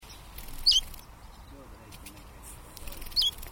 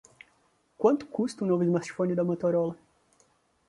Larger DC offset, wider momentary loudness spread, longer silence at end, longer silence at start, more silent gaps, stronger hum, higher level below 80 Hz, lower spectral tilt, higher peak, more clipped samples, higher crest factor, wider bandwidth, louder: neither; first, 27 LU vs 6 LU; second, 0 s vs 0.95 s; second, 0 s vs 0.8 s; neither; neither; first, -46 dBFS vs -70 dBFS; second, -0.5 dB/octave vs -7.5 dB/octave; about the same, -12 dBFS vs -10 dBFS; neither; about the same, 22 dB vs 18 dB; first, 19.5 kHz vs 11.5 kHz; first, -25 LUFS vs -28 LUFS